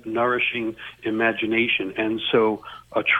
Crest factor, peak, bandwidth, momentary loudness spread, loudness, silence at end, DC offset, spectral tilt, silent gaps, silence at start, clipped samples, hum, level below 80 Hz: 16 dB; -6 dBFS; 4.6 kHz; 9 LU; -23 LUFS; 0 s; under 0.1%; -6 dB/octave; none; 0.05 s; under 0.1%; none; -60 dBFS